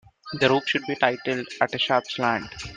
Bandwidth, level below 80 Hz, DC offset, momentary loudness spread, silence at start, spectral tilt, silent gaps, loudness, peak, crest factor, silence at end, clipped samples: 9.6 kHz; -58 dBFS; under 0.1%; 7 LU; 0.25 s; -4.5 dB/octave; none; -24 LUFS; -4 dBFS; 22 dB; 0 s; under 0.1%